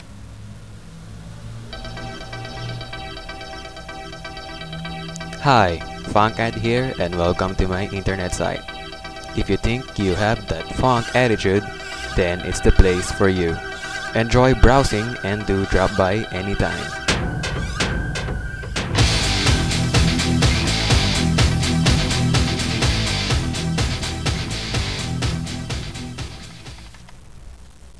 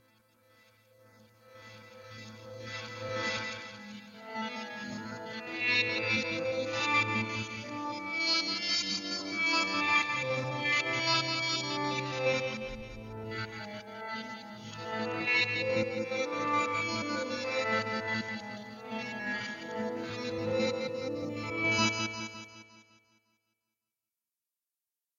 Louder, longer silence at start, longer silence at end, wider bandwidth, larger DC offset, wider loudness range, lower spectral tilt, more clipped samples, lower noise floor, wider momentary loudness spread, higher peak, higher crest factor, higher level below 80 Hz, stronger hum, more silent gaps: first, -20 LUFS vs -32 LUFS; second, 0 s vs 1.45 s; second, 0 s vs 2.35 s; second, 11 kHz vs 12.5 kHz; first, 0.5% vs under 0.1%; about the same, 12 LU vs 10 LU; first, -5 dB/octave vs -3.5 dB/octave; neither; second, -41 dBFS vs under -90 dBFS; about the same, 16 LU vs 16 LU; first, 0 dBFS vs -14 dBFS; about the same, 20 dB vs 20 dB; first, -28 dBFS vs -66 dBFS; neither; neither